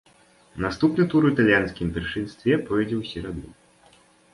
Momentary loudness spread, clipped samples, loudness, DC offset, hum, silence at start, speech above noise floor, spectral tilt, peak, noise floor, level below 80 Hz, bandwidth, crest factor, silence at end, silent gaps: 14 LU; under 0.1%; -23 LUFS; under 0.1%; none; 0.55 s; 34 dB; -7.5 dB/octave; -6 dBFS; -57 dBFS; -46 dBFS; 11.5 kHz; 18 dB; 0.8 s; none